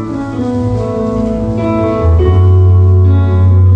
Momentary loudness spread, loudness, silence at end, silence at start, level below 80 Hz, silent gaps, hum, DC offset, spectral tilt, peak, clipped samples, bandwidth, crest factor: 7 LU; -11 LUFS; 0 s; 0 s; -22 dBFS; none; none; under 0.1%; -10 dB/octave; 0 dBFS; under 0.1%; 4 kHz; 8 dB